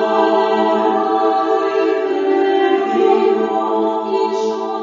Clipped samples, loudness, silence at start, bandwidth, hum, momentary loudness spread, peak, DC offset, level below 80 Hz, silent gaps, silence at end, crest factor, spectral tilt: under 0.1%; -16 LUFS; 0 s; 7.4 kHz; none; 4 LU; -2 dBFS; under 0.1%; -66 dBFS; none; 0 s; 14 dB; -5.5 dB/octave